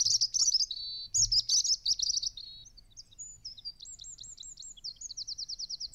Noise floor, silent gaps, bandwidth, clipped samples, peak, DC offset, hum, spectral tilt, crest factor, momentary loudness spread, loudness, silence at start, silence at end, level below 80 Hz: -54 dBFS; none; 16 kHz; under 0.1%; -16 dBFS; under 0.1%; none; 2.5 dB/octave; 16 dB; 20 LU; -28 LUFS; 0 s; 0.05 s; -58 dBFS